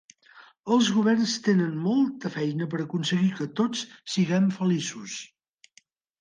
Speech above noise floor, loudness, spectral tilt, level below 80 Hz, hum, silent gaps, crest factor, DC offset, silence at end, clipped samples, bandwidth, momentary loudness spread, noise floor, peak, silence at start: 37 dB; -25 LUFS; -5.5 dB/octave; -72 dBFS; none; none; 16 dB; under 0.1%; 0.95 s; under 0.1%; 9.8 kHz; 11 LU; -62 dBFS; -10 dBFS; 0.35 s